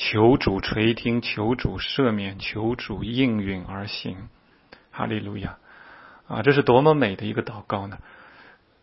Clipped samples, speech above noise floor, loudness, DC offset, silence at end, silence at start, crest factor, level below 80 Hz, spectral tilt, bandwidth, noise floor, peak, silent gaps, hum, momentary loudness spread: under 0.1%; 30 dB; -23 LUFS; under 0.1%; 0.6 s; 0 s; 22 dB; -46 dBFS; -10 dB/octave; 5.8 kHz; -53 dBFS; -2 dBFS; none; none; 16 LU